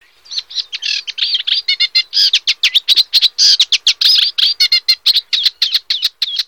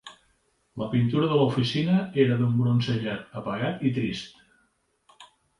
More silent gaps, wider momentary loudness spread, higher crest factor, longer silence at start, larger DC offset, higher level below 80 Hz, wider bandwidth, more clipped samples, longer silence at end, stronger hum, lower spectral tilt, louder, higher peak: neither; second, 9 LU vs 12 LU; about the same, 14 dB vs 18 dB; first, 0.3 s vs 0.05 s; first, 0.2% vs under 0.1%; about the same, -64 dBFS vs -60 dBFS; first, 19 kHz vs 11 kHz; neither; second, 0.05 s vs 0.35 s; neither; second, 5.5 dB/octave vs -7.5 dB/octave; first, -11 LUFS vs -25 LUFS; first, 0 dBFS vs -8 dBFS